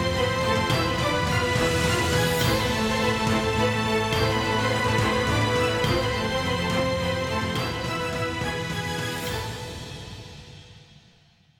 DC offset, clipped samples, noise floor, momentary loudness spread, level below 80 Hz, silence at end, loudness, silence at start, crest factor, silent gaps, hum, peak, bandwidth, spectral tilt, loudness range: under 0.1%; under 0.1%; -58 dBFS; 8 LU; -42 dBFS; 0.8 s; -24 LUFS; 0 s; 16 dB; none; none; -10 dBFS; 19 kHz; -4.5 dB/octave; 7 LU